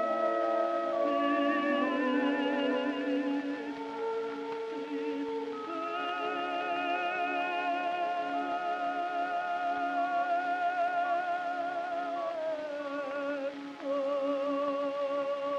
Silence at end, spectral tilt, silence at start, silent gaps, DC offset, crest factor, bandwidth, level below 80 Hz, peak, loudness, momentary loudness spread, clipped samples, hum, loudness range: 0 s; -4.5 dB/octave; 0 s; none; under 0.1%; 14 dB; 8.8 kHz; -84 dBFS; -18 dBFS; -32 LUFS; 7 LU; under 0.1%; none; 4 LU